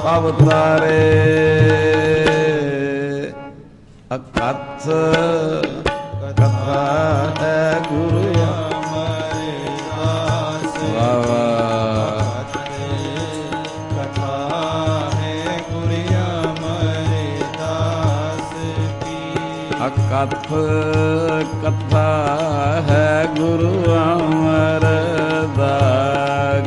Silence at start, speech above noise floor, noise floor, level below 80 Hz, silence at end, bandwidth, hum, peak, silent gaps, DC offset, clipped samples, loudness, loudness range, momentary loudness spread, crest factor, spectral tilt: 0 s; 26 dB; -42 dBFS; -42 dBFS; 0 s; 10.5 kHz; none; 0 dBFS; none; under 0.1%; under 0.1%; -18 LUFS; 5 LU; 10 LU; 16 dB; -6.5 dB/octave